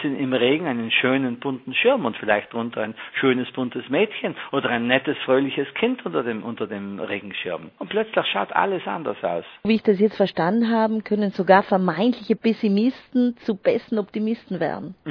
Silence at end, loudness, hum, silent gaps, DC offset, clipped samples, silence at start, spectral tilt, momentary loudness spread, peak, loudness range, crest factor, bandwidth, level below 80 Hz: 0 s; -22 LUFS; none; none; under 0.1%; under 0.1%; 0 s; -8 dB/octave; 10 LU; 0 dBFS; 5 LU; 22 dB; 5.4 kHz; -66 dBFS